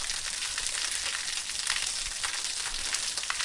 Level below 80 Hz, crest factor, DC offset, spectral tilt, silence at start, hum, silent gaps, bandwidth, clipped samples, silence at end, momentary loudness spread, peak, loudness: -50 dBFS; 26 dB; under 0.1%; 2 dB/octave; 0 s; none; none; 11.5 kHz; under 0.1%; 0 s; 2 LU; -8 dBFS; -29 LUFS